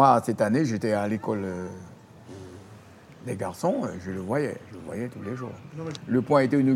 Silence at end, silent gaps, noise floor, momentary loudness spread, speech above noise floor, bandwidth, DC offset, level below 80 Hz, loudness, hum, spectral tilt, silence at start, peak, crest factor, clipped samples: 0 s; none; -48 dBFS; 22 LU; 23 dB; 14.5 kHz; under 0.1%; -66 dBFS; -27 LUFS; none; -7 dB/octave; 0 s; -4 dBFS; 22 dB; under 0.1%